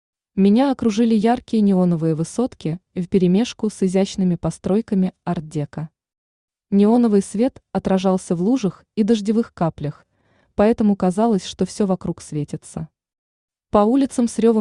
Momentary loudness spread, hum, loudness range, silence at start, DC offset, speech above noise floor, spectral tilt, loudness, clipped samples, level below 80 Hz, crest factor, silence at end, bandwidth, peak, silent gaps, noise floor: 12 LU; none; 3 LU; 0.35 s; under 0.1%; 43 dB; -7 dB/octave; -19 LUFS; under 0.1%; -50 dBFS; 16 dB; 0 s; 11 kHz; -4 dBFS; 6.18-6.48 s, 13.18-13.48 s; -62 dBFS